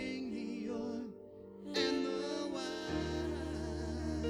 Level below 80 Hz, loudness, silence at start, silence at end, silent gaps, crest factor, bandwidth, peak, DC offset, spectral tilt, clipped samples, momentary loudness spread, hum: -50 dBFS; -39 LUFS; 0 s; 0 s; none; 18 dB; 14 kHz; -20 dBFS; under 0.1%; -5 dB/octave; under 0.1%; 11 LU; none